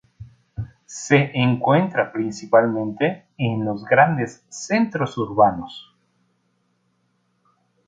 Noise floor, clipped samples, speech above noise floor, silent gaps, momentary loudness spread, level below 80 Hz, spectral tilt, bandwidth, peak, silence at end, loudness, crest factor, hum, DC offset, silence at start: -68 dBFS; under 0.1%; 48 dB; none; 18 LU; -54 dBFS; -6 dB/octave; 9.4 kHz; -2 dBFS; 2.05 s; -20 LUFS; 20 dB; none; under 0.1%; 0.2 s